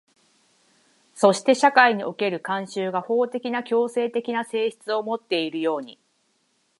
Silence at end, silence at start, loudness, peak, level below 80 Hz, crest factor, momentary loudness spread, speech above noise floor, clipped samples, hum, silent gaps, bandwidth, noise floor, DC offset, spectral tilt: 0.85 s; 1.15 s; -23 LUFS; -2 dBFS; -80 dBFS; 22 dB; 10 LU; 46 dB; under 0.1%; none; none; 11.5 kHz; -68 dBFS; under 0.1%; -4 dB/octave